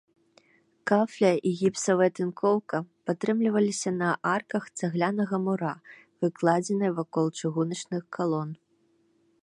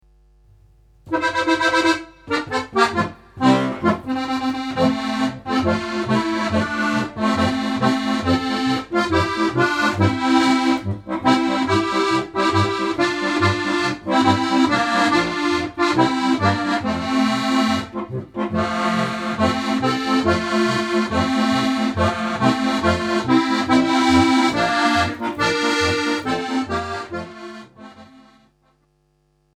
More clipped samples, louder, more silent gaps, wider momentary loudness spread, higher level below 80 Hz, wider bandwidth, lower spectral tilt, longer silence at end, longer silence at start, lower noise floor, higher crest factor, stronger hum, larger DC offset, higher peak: neither; second, -27 LUFS vs -19 LUFS; neither; first, 9 LU vs 6 LU; second, -76 dBFS vs -46 dBFS; second, 11.5 kHz vs 13 kHz; about the same, -6 dB/octave vs -5 dB/octave; second, 0.85 s vs 1.55 s; second, 0.85 s vs 1.05 s; first, -68 dBFS vs -63 dBFS; about the same, 20 dB vs 16 dB; neither; neither; second, -8 dBFS vs -4 dBFS